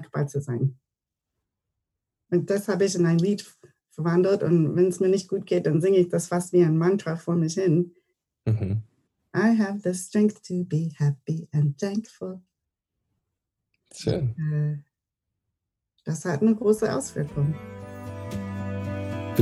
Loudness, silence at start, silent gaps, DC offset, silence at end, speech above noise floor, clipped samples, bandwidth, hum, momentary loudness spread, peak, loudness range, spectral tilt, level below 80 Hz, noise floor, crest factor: -25 LUFS; 0 s; none; under 0.1%; 0 s; 63 dB; under 0.1%; 14.5 kHz; none; 12 LU; -4 dBFS; 9 LU; -7 dB/octave; -60 dBFS; -87 dBFS; 20 dB